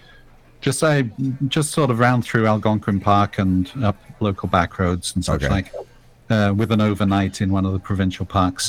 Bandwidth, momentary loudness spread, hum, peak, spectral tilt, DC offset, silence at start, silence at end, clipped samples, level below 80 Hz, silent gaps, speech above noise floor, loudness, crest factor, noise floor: 16 kHz; 6 LU; none; -2 dBFS; -6 dB/octave; under 0.1%; 0.6 s; 0 s; under 0.1%; -40 dBFS; none; 28 dB; -20 LUFS; 18 dB; -47 dBFS